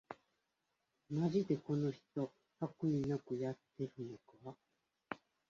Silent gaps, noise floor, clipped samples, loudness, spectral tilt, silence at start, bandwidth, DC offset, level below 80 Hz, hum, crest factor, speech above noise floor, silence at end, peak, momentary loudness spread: none; -86 dBFS; under 0.1%; -41 LUFS; -8.5 dB/octave; 0.1 s; 7.4 kHz; under 0.1%; -74 dBFS; none; 20 dB; 46 dB; 0.35 s; -22 dBFS; 18 LU